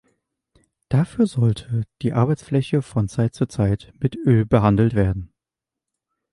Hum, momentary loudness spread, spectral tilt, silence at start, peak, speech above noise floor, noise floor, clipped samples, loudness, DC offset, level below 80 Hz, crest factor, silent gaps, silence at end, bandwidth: none; 7 LU; -8.5 dB/octave; 0.9 s; -4 dBFS; 68 dB; -87 dBFS; under 0.1%; -21 LUFS; under 0.1%; -42 dBFS; 18 dB; none; 1.05 s; 11.5 kHz